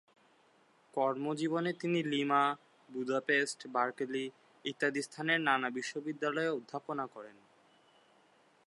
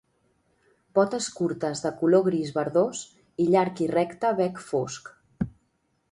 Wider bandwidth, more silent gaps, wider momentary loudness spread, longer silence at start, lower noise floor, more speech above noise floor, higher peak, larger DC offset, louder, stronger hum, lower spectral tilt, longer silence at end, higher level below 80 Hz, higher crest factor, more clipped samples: about the same, 11.5 kHz vs 11.5 kHz; neither; about the same, 13 LU vs 12 LU; about the same, 0.95 s vs 0.95 s; about the same, -68 dBFS vs -71 dBFS; second, 33 dB vs 47 dB; second, -14 dBFS vs -8 dBFS; neither; second, -34 LUFS vs -26 LUFS; neither; about the same, -4.5 dB/octave vs -5.5 dB/octave; first, 1.35 s vs 0.65 s; second, -90 dBFS vs -60 dBFS; about the same, 22 dB vs 20 dB; neither